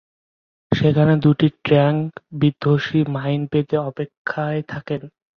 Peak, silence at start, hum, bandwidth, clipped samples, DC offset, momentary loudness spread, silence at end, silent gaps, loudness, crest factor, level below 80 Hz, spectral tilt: -2 dBFS; 0.7 s; none; 6.2 kHz; under 0.1%; under 0.1%; 12 LU; 0.3 s; 4.17-4.25 s; -20 LUFS; 18 dB; -52 dBFS; -9 dB/octave